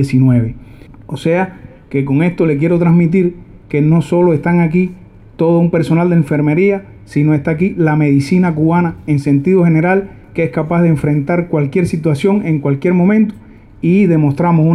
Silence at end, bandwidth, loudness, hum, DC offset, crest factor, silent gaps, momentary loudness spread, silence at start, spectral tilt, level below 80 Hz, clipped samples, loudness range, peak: 0 s; 11 kHz; -13 LUFS; none; under 0.1%; 10 dB; none; 8 LU; 0 s; -9 dB/octave; -42 dBFS; under 0.1%; 1 LU; -2 dBFS